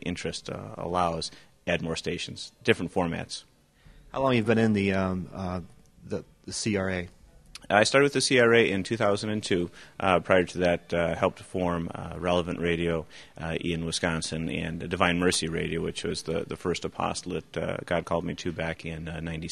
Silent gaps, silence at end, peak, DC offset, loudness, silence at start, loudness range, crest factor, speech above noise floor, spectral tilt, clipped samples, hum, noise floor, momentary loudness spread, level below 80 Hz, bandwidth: none; 0 s; -4 dBFS; 0.1%; -28 LUFS; 0.05 s; 6 LU; 24 dB; 28 dB; -4.5 dB/octave; under 0.1%; none; -56 dBFS; 14 LU; -52 dBFS; 13 kHz